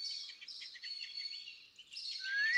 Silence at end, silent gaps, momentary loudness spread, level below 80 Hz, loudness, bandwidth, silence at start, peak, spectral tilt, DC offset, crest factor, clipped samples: 0 s; none; 11 LU; under -90 dBFS; -42 LUFS; 12 kHz; 0 s; -22 dBFS; 4 dB/octave; under 0.1%; 20 dB; under 0.1%